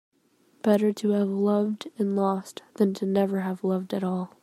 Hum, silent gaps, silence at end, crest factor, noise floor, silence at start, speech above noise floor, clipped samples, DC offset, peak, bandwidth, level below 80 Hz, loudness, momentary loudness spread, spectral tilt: none; none; 0.15 s; 18 dB; -64 dBFS; 0.65 s; 39 dB; under 0.1%; under 0.1%; -8 dBFS; 13.5 kHz; -76 dBFS; -26 LUFS; 7 LU; -7.5 dB/octave